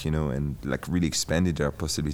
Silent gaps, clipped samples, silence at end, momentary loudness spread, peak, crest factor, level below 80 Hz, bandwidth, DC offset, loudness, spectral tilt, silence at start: none; under 0.1%; 0 s; 5 LU; -12 dBFS; 14 dB; -40 dBFS; 19 kHz; under 0.1%; -27 LUFS; -5 dB/octave; 0 s